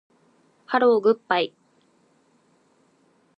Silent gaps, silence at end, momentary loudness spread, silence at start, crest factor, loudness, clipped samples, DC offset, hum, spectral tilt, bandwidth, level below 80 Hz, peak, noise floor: none; 1.9 s; 8 LU; 0.7 s; 22 dB; -22 LUFS; under 0.1%; under 0.1%; none; -6 dB/octave; 5.6 kHz; -84 dBFS; -4 dBFS; -63 dBFS